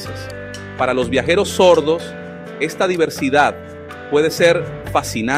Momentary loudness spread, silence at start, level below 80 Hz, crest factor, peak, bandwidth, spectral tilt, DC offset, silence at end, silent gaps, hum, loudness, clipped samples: 18 LU; 0 s; -46 dBFS; 16 dB; -2 dBFS; 16 kHz; -4.5 dB/octave; under 0.1%; 0 s; none; none; -16 LUFS; under 0.1%